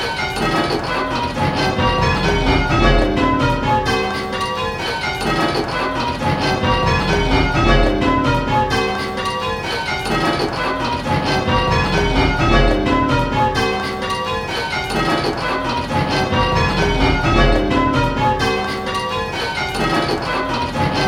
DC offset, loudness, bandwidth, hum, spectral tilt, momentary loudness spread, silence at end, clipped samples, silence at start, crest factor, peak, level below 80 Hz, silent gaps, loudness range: under 0.1%; -17 LUFS; 15 kHz; none; -5.5 dB/octave; 6 LU; 0 s; under 0.1%; 0 s; 16 dB; 0 dBFS; -26 dBFS; none; 2 LU